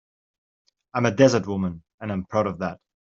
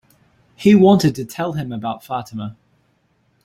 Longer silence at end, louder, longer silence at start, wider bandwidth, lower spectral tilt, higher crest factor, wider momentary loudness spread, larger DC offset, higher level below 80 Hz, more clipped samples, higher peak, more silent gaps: second, 0.25 s vs 0.95 s; second, -24 LUFS vs -17 LUFS; first, 0.95 s vs 0.6 s; second, 7.6 kHz vs 14.5 kHz; about the same, -6 dB/octave vs -7 dB/octave; about the same, 22 dB vs 18 dB; second, 13 LU vs 19 LU; neither; second, -60 dBFS vs -54 dBFS; neither; about the same, -4 dBFS vs -2 dBFS; first, 1.94-1.98 s vs none